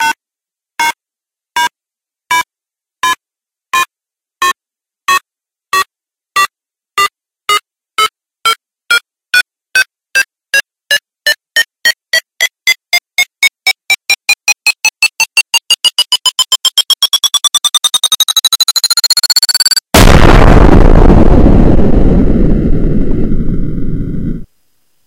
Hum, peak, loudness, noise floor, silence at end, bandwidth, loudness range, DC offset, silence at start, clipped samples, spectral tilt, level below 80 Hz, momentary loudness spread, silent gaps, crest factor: none; 0 dBFS; -10 LUFS; -87 dBFS; 0.6 s; 17 kHz; 10 LU; under 0.1%; 0 s; 0.8%; -3 dB/octave; -16 dBFS; 11 LU; none; 10 dB